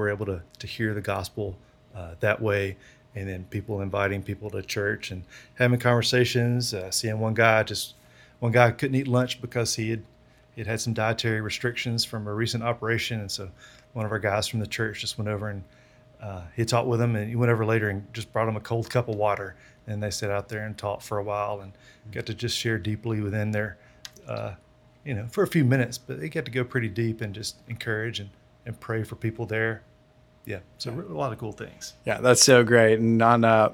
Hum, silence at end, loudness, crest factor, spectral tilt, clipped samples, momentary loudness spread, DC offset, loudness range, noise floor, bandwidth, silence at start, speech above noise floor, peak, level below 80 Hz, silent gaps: none; 0 s; -26 LUFS; 26 dB; -4.5 dB/octave; under 0.1%; 17 LU; under 0.1%; 7 LU; -58 dBFS; 17.5 kHz; 0 s; 32 dB; -2 dBFS; -58 dBFS; none